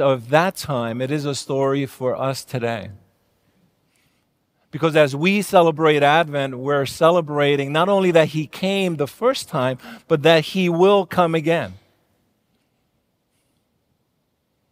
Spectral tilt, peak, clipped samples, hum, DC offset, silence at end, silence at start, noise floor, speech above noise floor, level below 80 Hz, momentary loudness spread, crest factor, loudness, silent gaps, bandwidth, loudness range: -5.5 dB/octave; 0 dBFS; under 0.1%; none; under 0.1%; 2.95 s; 0 s; -70 dBFS; 51 dB; -64 dBFS; 9 LU; 20 dB; -19 LUFS; none; 16 kHz; 9 LU